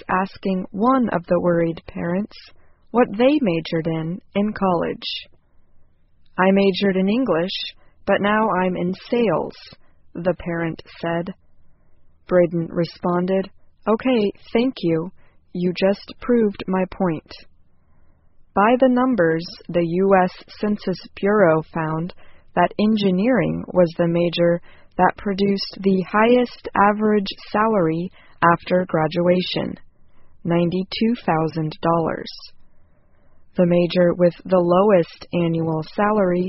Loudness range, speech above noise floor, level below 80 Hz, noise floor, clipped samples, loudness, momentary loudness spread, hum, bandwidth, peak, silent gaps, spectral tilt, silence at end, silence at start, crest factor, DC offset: 4 LU; 32 dB; -50 dBFS; -51 dBFS; under 0.1%; -20 LUFS; 11 LU; none; 6 kHz; -2 dBFS; none; -5.5 dB/octave; 0 s; 0.1 s; 18 dB; under 0.1%